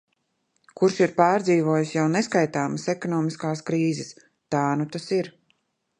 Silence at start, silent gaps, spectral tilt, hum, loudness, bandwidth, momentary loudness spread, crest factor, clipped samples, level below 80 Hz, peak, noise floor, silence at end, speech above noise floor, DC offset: 0.8 s; none; -6 dB/octave; none; -24 LUFS; 10.5 kHz; 8 LU; 20 dB; under 0.1%; -70 dBFS; -4 dBFS; -73 dBFS; 0.7 s; 50 dB; under 0.1%